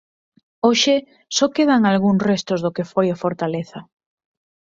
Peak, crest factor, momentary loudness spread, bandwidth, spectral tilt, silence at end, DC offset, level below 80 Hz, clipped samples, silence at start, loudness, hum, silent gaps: -2 dBFS; 18 dB; 9 LU; 7.8 kHz; -4.5 dB/octave; 0.95 s; under 0.1%; -62 dBFS; under 0.1%; 0.65 s; -19 LUFS; none; none